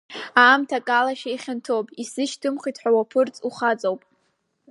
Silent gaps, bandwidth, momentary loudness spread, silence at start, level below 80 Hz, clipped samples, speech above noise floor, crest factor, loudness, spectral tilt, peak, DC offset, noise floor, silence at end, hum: none; 11.5 kHz; 14 LU; 0.1 s; -80 dBFS; under 0.1%; 49 dB; 20 dB; -22 LUFS; -3 dB/octave; -2 dBFS; under 0.1%; -70 dBFS; 0.75 s; none